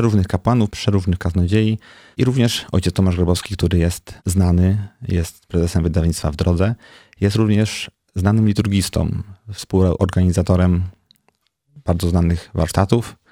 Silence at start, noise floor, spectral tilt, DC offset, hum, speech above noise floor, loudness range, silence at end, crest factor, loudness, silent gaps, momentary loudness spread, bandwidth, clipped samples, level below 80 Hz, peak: 0 s; -64 dBFS; -6.5 dB/octave; under 0.1%; none; 47 dB; 1 LU; 0.2 s; 16 dB; -19 LUFS; none; 7 LU; 15.5 kHz; under 0.1%; -32 dBFS; 0 dBFS